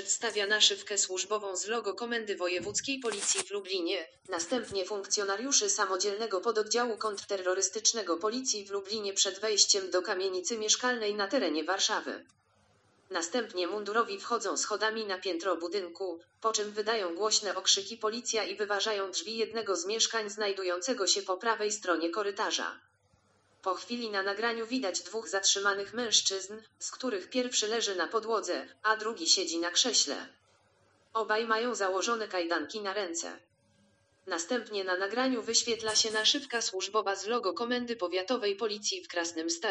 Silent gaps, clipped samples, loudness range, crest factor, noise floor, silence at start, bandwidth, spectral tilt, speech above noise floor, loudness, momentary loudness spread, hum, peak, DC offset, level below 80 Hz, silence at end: none; under 0.1%; 4 LU; 24 dB; -69 dBFS; 0 s; 10 kHz; 0 dB/octave; 37 dB; -30 LUFS; 9 LU; none; -8 dBFS; under 0.1%; -80 dBFS; 0 s